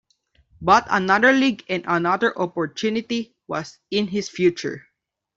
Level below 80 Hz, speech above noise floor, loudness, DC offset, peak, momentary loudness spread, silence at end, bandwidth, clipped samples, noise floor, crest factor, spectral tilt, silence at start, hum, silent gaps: -58 dBFS; 42 dB; -21 LUFS; under 0.1%; -2 dBFS; 14 LU; 0.6 s; 7.8 kHz; under 0.1%; -63 dBFS; 20 dB; -5 dB/octave; 0.6 s; none; none